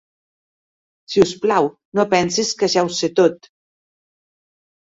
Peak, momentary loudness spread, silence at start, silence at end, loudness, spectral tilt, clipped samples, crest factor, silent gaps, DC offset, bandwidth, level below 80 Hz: -2 dBFS; 4 LU; 1.1 s; 1.55 s; -18 LUFS; -4 dB/octave; under 0.1%; 20 dB; 1.85-1.92 s; under 0.1%; 8 kHz; -56 dBFS